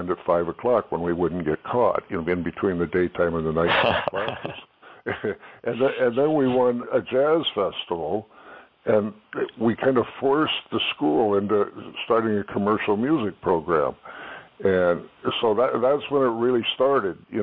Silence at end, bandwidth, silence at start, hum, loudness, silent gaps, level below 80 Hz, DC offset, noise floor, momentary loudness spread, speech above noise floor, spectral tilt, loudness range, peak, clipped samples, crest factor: 0 s; 5.4 kHz; 0 s; none; -23 LUFS; none; -54 dBFS; under 0.1%; -47 dBFS; 10 LU; 24 dB; -9 dB/octave; 2 LU; -8 dBFS; under 0.1%; 16 dB